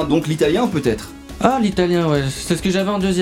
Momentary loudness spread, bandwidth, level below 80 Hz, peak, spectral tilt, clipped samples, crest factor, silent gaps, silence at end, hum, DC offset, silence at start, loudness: 5 LU; 16.5 kHz; -38 dBFS; 0 dBFS; -5.5 dB/octave; under 0.1%; 18 dB; none; 0 s; none; under 0.1%; 0 s; -18 LUFS